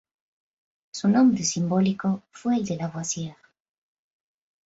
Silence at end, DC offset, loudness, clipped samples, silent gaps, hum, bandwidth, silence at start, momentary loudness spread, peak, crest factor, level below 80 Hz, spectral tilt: 1.35 s; under 0.1%; -24 LUFS; under 0.1%; none; none; 8 kHz; 0.95 s; 11 LU; -10 dBFS; 16 dB; -64 dBFS; -5.5 dB/octave